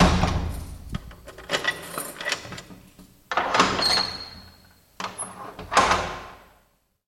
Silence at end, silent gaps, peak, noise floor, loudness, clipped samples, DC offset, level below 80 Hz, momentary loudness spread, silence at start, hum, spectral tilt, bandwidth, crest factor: 0.7 s; none; -4 dBFS; -65 dBFS; -25 LUFS; under 0.1%; under 0.1%; -38 dBFS; 19 LU; 0 s; none; -3.5 dB/octave; 16.5 kHz; 22 dB